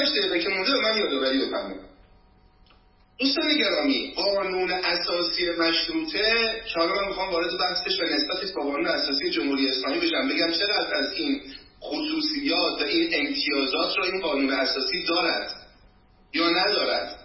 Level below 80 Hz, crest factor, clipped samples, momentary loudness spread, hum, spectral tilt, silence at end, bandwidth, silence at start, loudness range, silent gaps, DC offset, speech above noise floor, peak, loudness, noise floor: -56 dBFS; 16 dB; under 0.1%; 7 LU; none; -5.5 dB/octave; 0 s; 6 kHz; 0 s; 2 LU; none; under 0.1%; 32 dB; -10 dBFS; -24 LUFS; -57 dBFS